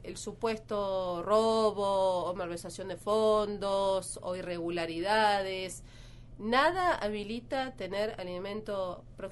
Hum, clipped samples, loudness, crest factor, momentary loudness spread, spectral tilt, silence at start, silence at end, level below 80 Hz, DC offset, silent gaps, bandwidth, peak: none; under 0.1%; -31 LUFS; 20 dB; 12 LU; -4 dB/octave; 0 s; 0 s; -54 dBFS; under 0.1%; none; 11.5 kHz; -12 dBFS